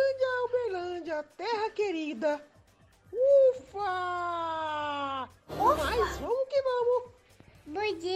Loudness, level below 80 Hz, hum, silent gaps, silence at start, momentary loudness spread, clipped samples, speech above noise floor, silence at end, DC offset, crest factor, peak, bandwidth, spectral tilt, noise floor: -30 LUFS; -54 dBFS; none; none; 0 s; 11 LU; under 0.1%; 31 dB; 0 s; under 0.1%; 16 dB; -12 dBFS; 14 kHz; -4.5 dB/octave; -61 dBFS